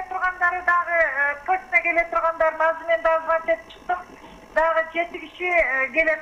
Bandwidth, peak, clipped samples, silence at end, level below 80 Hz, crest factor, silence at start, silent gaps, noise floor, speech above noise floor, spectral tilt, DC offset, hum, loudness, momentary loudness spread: 9.4 kHz; -6 dBFS; under 0.1%; 0 s; -50 dBFS; 16 dB; 0 s; none; -44 dBFS; 22 dB; -4 dB/octave; under 0.1%; none; -21 LUFS; 8 LU